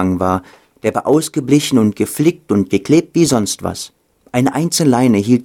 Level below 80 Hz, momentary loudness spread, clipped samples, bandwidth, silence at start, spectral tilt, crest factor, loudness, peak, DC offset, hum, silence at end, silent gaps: -50 dBFS; 9 LU; under 0.1%; 17.5 kHz; 0 s; -5.5 dB/octave; 14 dB; -15 LUFS; 0 dBFS; under 0.1%; none; 0 s; none